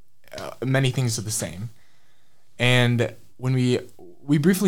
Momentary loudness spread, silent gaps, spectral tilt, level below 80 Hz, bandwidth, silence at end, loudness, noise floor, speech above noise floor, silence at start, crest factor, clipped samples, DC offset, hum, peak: 18 LU; none; -5 dB/octave; -54 dBFS; 16.5 kHz; 0 s; -23 LUFS; -65 dBFS; 44 dB; 0 s; 18 dB; under 0.1%; under 0.1%; none; -6 dBFS